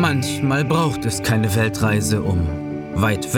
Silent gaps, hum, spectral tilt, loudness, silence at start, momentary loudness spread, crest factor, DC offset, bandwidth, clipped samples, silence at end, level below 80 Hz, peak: none; none; -5.5 dB/octave; -20 LUFS; 0 s; 4 LU; 14 dB; under 0.1%; 18 kHz; under 0.1%; 0 s; -42 dBFS; -6 dBFS